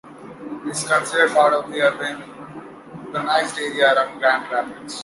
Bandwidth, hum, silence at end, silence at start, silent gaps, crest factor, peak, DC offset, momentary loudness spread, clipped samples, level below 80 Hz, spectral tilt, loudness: 11.5 kHz; none; 0 s; 0.05 s; none; 18 dB; -2 dBFS; under 0.1%; 20 LU; under 0.1%; -66 dBFS; -2.5 dB/octave; -19 LUFS